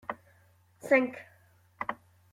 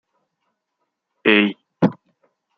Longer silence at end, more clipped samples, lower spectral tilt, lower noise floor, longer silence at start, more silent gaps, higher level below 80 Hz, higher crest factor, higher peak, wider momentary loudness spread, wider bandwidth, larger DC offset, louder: second, 0.4 s vs 0.65 s; neither; second, -5.5 dB/octave vs -7.5 dB/octave; second, -64 dBFS vs -76 dBFS; second, 0.1 s vs 1.25 s; neither; second, -74 dBFS vs -68 dBFS; about the same, 24 dB vs 22 dB; second, -10 dBFS vs -2 dBFS; first, 22 LU vs 6 LU; first, 15 kHz vs 6.2 kHz; neither; second, -30 LUFS vs -19 LUFS